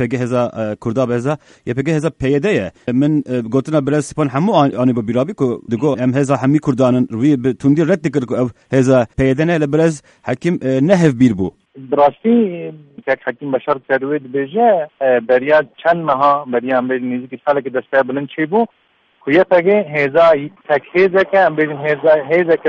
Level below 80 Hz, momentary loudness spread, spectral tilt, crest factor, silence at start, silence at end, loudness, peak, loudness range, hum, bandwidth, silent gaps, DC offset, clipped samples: -48 dBFS; 8 LU; -7 dB/octave; 14 dB; 0 s; 0 s; -15 LUFS; 0 dBFS; 3 LU; none; 11 kHz; none; under 0.1%; under 0.1%